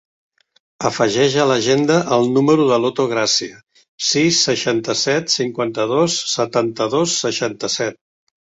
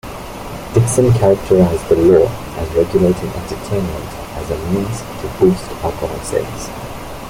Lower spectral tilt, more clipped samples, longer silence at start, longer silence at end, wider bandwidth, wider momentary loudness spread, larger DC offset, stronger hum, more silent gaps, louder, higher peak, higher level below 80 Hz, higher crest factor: second, -3.5 dB/octave vs -6.5 dB/octave; neither; first, 0.8 s vs 0.05 s; first, 0.55 s vs 0 s; second, 8.2 kHz vs 16.5 kHz; second, 7 LU vs 15 LU; neither; neither; first, 3.88-3.98 s vs none; about the same, -17 LUFS vs -16 LUFS; about the same, -2 dBFS vs -2 dBFS; second, -58 dBFS vs -34 dBFS; about the same, 16 dB vs 14 dB